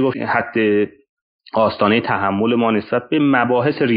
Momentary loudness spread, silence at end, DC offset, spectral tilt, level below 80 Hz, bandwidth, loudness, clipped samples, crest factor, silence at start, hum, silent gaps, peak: 5 LU; 0 s; under 0.1%; -4.5 dB/octave; -58 dBFS; 5.2 kHz; -17 LUFS; under 0.1%; 14 dB; 0 s; none; 1.09-1.39 s; -2 dBFS